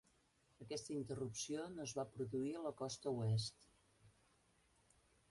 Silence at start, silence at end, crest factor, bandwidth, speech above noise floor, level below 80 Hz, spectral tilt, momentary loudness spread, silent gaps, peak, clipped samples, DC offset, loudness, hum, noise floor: 0.6 s; 1.2 s; 16 dB; 11.5 kHz; 33 dB; -76 dBFS; -5.5 dB/octave; 8 LU; none; -32 dBFS; under 0.1%; under 0.1%; -45 LUFS; none; -77 dBFS